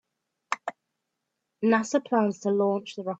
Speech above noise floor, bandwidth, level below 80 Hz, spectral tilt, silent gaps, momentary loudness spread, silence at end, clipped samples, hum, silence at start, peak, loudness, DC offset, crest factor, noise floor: 57 dB; 8 kHz; -78 dBFS; -5.5 dB/octave; none; 9 LU; 0 s; under 0.1%; none; 0.5 s; -10 dBFS; -27 LUFS; under 0.1%; 18 dB; -82 dBFS